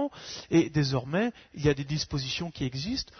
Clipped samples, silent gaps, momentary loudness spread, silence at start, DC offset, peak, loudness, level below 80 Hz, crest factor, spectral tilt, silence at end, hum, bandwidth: under 0.1%; none; 8 LU; 0 s; under 0.1%; -12 dBFS; -29 LUFS; -50 dBFS; 18 dB; -5.5 dB/octave; 0.15 s; none; 6.6 kHz